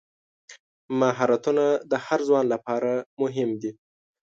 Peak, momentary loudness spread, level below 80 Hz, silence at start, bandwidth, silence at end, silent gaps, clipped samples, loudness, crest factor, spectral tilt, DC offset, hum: -8 dBFS; 7 LU; -74 dBFS; 0.5 s; 7.8 kHz; 0.5 s; 0.59-0.89 s, 3.06-3.17 s; under 0.1%; -24 LUFS; 16 dB; -6 dB/octave; under 0.1%; none